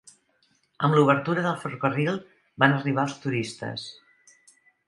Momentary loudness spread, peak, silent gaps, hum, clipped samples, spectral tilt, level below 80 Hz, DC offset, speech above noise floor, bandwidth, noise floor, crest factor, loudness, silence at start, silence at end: 14 LU; -2 dBFS; none; none; under 0.1%; -6.5 dB/octave; -70 dBFS; under 0.1%; 43 dB; 11.5 kHz; -67 dBFS; 26 dB; -25 LUFS; 0.8 s; 0.95 s